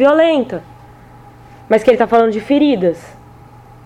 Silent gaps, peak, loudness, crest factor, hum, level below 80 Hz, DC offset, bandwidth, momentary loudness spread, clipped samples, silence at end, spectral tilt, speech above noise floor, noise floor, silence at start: none; -2 dBFS; -13 LUFS; 14 dB; none; -48 dBFS; under 0.1%; 11.5 kHz; 13 LU; under 0.1%; 0.8 s; -6.5 dB/octave; 27 dB; -40 dBFS; 0 s